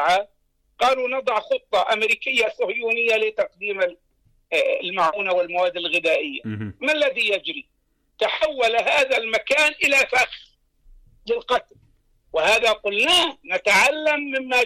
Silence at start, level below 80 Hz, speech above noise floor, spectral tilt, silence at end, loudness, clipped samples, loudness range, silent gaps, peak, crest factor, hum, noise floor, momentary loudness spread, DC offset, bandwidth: 0 s; -58 dBFS; 34 dB; -2 dB/octave; 0 s; -20 LUFS; under 0.1%; 3 LU; none; -10 dBFS; 12 dB; none; -55 dBFS; 9 LU; under 0.1%; 16 kHz